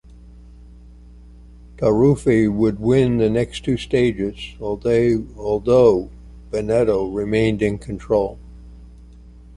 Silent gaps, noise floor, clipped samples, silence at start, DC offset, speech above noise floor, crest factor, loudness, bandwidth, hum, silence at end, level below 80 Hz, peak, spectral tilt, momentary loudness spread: none; -42 dBFS; under 0.1%; 0.35 s; under 0.1%; 25 dB; 18 dB; -19 LUFS; 11.5 kHz; none; 0.25 s; -40 dBFS; -2 dBFS; -7.5 dB/octave; 11 LU